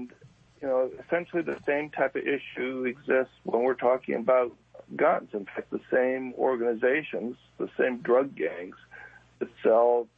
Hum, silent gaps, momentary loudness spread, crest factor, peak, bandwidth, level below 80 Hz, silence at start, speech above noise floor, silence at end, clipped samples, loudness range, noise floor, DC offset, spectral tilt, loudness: none; none; 14 LU; 18 dB; -10 dBFS; 4.7 kHz; -70 dBFS; 0 s; 29 dB; 0.1 s; under 0.1%; 2 LU; -56 dBFS; under 0.1%; -7.5 dB/octave; -28 LUFS